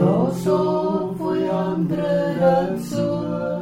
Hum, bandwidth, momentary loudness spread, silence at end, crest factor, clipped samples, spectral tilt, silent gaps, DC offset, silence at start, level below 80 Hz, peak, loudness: none; 15.5 kHz; 6 LU; 0 s; 16 dB; under 0.1%; -8 dB/octave; none; under 0.1%; 0 s; -52 dBFS; -4 dBFS; -21 LUFS